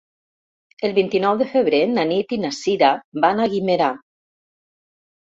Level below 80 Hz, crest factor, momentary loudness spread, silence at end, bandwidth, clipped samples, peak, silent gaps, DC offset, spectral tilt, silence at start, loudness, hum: -64 dBFS; 18 dB; 5 LU; 1.25 s; 7.8 kHz; under 0.1%; -2 dBFS; 3.04-3.12 s; under 0.1%; -5.5 dB/octave; 0.8 s; -19 LUFS; none